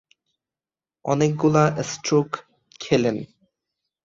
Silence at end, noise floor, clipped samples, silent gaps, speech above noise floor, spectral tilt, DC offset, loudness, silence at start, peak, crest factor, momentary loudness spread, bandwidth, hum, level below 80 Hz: 0.8 s; under -90 dBFS; under 0.1%; none; over 69 dB; -6 dB/octave; under 0.1%; -22 LUFS; 1.05 s; -4 dBFS; 20 dB; 16 LU; 7.8 kHz; none; -60 dBFS